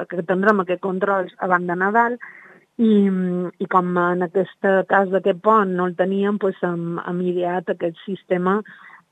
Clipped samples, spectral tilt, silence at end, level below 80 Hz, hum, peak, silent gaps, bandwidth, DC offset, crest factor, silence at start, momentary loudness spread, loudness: under 0.1%; -9 dB/octave; 0.15 s; -74 dBFS; none; -2 dBFS; none; 8 kHz; under 0.1%; 20 dB; 0 s; 9 LU; -20 LUFS